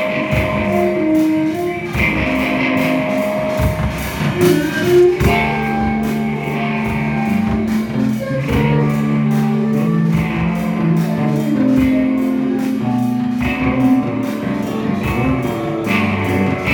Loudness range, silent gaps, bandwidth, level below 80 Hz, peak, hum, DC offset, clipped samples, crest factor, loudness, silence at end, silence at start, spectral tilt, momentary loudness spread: 2 LU; none; 18 kHz; -34 dBFS; -2 dBFS; none; under 0.1%; under 0.1%; 14 dB; -16 LUFS; 0 s; 0 s; -7 dB/octave; 6 LU